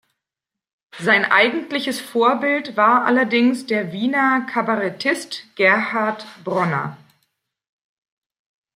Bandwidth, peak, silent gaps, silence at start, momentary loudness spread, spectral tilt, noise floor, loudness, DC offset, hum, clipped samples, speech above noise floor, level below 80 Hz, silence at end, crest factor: 16 kHz; -2 dBFS; none; 0.95 s; 10 LU; -5 dB/octave; -86 dBFS; -18 LUFS; under 0.1%; none; under 0.1%; 68 dB; -72 dBFS; 1.8 s; 20 dB